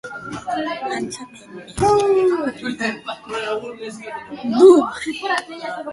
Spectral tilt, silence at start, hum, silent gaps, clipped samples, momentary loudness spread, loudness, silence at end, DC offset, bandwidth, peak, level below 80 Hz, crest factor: -5 dB/octave; 0.05 s; none; none; under 0.1%; 20 LU; -19 LUFS; 0 s; under 0.1%; 11.5 kHz; 0 dBFS; -48 dBFS; 18 dB